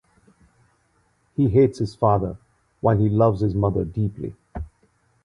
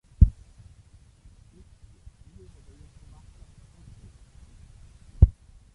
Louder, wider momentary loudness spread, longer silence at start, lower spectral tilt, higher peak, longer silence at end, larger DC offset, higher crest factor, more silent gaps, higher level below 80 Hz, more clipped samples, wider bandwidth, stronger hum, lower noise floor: about the same, -21 LUFS vs -23 LUFS; second, 19 LU vs 28 LU; first, 1.4 s vs 0.2 s; about the same, -10 dB/octave vs -10 dB/octave; about the same, -4 dBFS vs -4 dBFS; about the same, 0.55 s vs 0.45 s; neither; second, 18 dB vs 26 dB; neither; second, -42 dBFS vs -30 dBFS; neither; first, 9.6 kHz vs 2.3 kHz; neither; first, -65 dBFS vs -54 dBFS